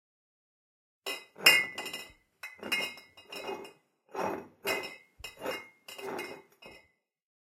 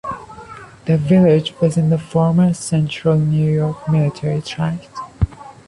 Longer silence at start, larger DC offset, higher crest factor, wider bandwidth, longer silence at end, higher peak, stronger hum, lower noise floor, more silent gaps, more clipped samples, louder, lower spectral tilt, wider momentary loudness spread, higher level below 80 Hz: first, 1.05 s vs 0.05 s; neither; first, 30 dB vs 14 dB; first, 16.5 kHz vs 11.5 kHz; first, 0.8 s vs 0.15 s; second, -6 dBFS vs -2 dBFS; neither; first, -67 dBFS vs -37 dBFS; neither; neither; second, -31 LUFS vs -17 LUFS; second, -1 dB/octave vs -7.5 dB/octave; first, 24 LU vs 16 LU; second, -72 dBFS vs -38 dBFS